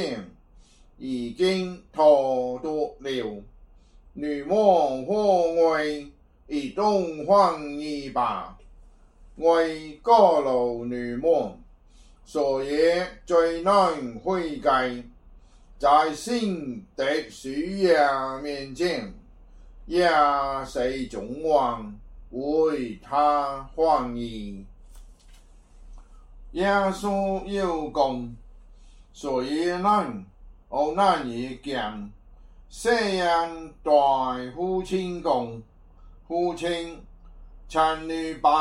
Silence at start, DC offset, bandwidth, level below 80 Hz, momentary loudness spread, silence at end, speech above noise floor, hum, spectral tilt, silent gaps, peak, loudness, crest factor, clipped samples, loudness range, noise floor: 0 s; under 0.1%; 12 kHz; -48 dBFS; 14 LU; 0 s; 29 dB; none; -5 dB/octave; none; -4 dBFS; -24 LUFS; 20 dB; under 0.1%; 4 LU; -53 dBFS